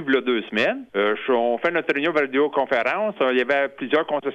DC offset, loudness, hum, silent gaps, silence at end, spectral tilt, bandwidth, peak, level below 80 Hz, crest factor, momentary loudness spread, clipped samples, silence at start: under 0.1%; -22 LUFS; none; none; 0 s; -5.5 dB/octave; 8.2 kHz; -6 dBFS; -68 dBFS; 16 dB; 2 LU; under 0.1%; 0 s